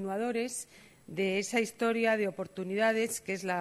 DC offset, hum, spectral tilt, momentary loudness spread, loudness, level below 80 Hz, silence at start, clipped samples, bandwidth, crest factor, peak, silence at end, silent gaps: under 0.1%; none; -4 dB/octave; 10 LU; -31 LUFS; -74 dBFS; 0 s; under 0.1%; 13 kHz; 16 dB; -14 dBFS; 0 s; none